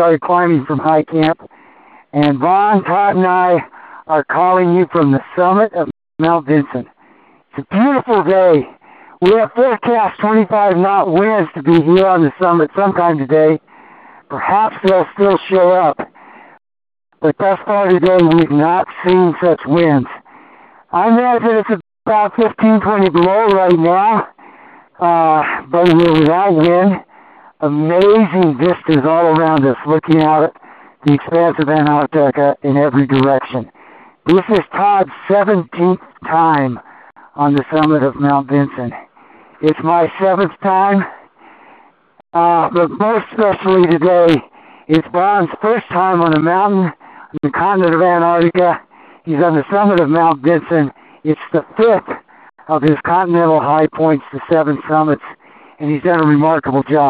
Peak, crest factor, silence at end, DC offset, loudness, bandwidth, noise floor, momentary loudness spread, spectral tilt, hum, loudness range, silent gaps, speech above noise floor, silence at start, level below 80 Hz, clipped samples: 0 dBFS; 14 dB; 0 s; under 0.1%; -13 LUFS; 5 kHz; -49 dBFS; 9 LU; -9.5 dB/octave; none; 3 LU; none; 36 dB; 0 s; -52 dBFS; under 0.1%